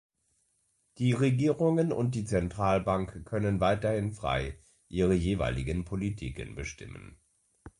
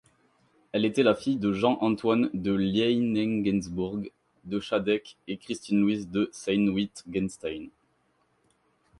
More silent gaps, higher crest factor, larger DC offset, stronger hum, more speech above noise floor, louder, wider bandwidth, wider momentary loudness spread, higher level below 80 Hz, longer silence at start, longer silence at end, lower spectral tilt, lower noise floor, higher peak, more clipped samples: neither; about the same, 18 dB vs 20 dB; neither; neither; about the same, 45 dB vs 43 dB; second, -30 LUFS vs -27 LUFS; about the same, 11.5 kHz vs 11.5 kHz; about the same, 13 LU vs 12 LU; first, -46 dBFS vs -58 dBFS; first, 1 s vs 0.75 s; second, 0.1 s vs 1.3 s; about the same, -7 dB/octave vs -6 dB/octave; first, -74 dBFS vs -70 dBFS; second, -14 dBFS vs -8 dBFS; neither